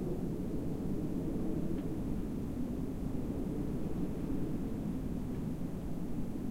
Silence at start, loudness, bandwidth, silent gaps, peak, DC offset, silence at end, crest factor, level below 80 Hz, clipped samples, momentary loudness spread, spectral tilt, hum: 0 s; -38 LUFS; 16 kHz; none; -22 dBFS; 0.1%; 0 s; 12 dB; -44 dBFS; under 0.1%; 3 LU; -8.5 dB/octave; none